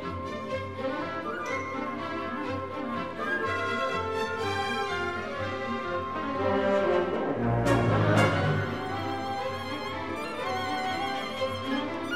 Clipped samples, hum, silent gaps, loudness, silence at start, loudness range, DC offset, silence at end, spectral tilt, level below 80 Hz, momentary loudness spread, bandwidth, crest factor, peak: under 0.1%; none; none; -29 LUFS; 0 s; 5 LU; 0.3%; 0 s; -6 dB/octave; -52 dBFS; 9 LU; 14 kHz; 18 dB; -12 dBFS